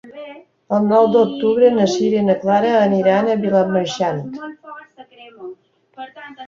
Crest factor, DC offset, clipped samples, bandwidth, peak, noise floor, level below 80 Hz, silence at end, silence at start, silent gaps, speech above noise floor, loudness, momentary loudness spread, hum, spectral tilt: 16 dB; under 0.1%; under 0.1%; 7.6 kHz; -2 dBFS; -41 dBFS; -62 dBFS; 0 s; 0.05 s; none; 24 dB; -16 LUFS; 22 LU; none; -6.5 dB/octave